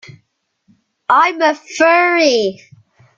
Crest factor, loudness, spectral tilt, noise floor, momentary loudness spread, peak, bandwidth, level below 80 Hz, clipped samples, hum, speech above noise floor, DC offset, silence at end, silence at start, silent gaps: 16 dB; -13 LUFS; -3 dB/octave; -64 dBFS; 8 LU; 0 dBFS; 7.6 kHz; -64 dBFS; under 0.1%; none; 51 dB; under 0.1%; 0.65 s; 1.1 s; none